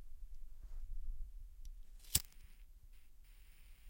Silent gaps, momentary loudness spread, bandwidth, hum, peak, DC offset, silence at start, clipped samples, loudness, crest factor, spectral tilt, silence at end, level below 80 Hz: none; 27 LU; 16.5 kHz; none; -12 dBFS; under 0.1%; 0 s; under 0.1%; -42 LUFS; 34 dB; -1 dB/octave; 0 s; -50 dBFS